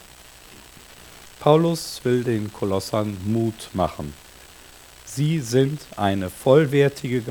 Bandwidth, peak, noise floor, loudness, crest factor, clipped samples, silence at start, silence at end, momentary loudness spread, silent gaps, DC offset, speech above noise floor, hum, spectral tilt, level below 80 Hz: 19 kHz; -2 dBFS; -46 dBFS; -22 LUFS; 20 dB; under 0.1%; 0.2 s; 0 s; 18 LU; none; under 0.1%; 25 dB; none; -6.5 dB/octave; -52 dBFS